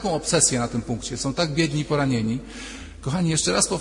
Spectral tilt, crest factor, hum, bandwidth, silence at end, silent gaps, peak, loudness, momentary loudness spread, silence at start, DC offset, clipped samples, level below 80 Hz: -4 dB/octave; 20 dB; none; 11 kHz; 0 s; none; -4 dBFS; -22 LUFS; 14 LU; 0 s; under 0.1%; under 0.1%; -44 dBFS